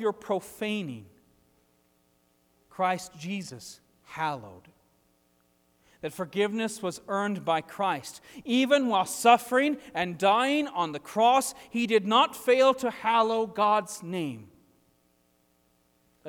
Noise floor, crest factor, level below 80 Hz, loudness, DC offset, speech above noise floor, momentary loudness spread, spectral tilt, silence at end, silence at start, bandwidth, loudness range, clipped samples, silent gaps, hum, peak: -68 dBFS; 22 dB; -72 dBFS; -27 LUFS; under 0.1%; 41 dB; 17 LU; -4 dB/octave; 0 s; 0 s; 19.5 kHz; 11 LU; under 0.1%; none; none; -6 dBFS